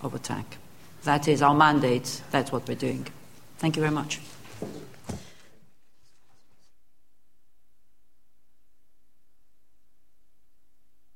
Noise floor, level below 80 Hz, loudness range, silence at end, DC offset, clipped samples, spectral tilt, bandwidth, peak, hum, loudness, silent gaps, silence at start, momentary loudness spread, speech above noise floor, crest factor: -74 dBFS; -60 dBFS; 21 LU; 5.9 s; 0.5%; under 0.1%; -5 dB/octave; 16.5 kHz; -4 dBFS; none; -26 LUFS; none; 0 s; 22 LU; 49 dB; 26 dB